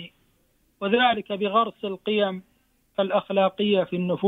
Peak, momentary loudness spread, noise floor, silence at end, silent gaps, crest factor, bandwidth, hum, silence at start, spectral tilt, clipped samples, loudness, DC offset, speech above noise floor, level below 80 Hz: -8 dBFS; 11 LU; -66 dBFS; 0 s; none; 18 dB; 4.5 kHz; none; 0 s; -8 dB/octave; under 0.1%; -24 LUFS; under 0.1%; 42 dB; -66 dBFS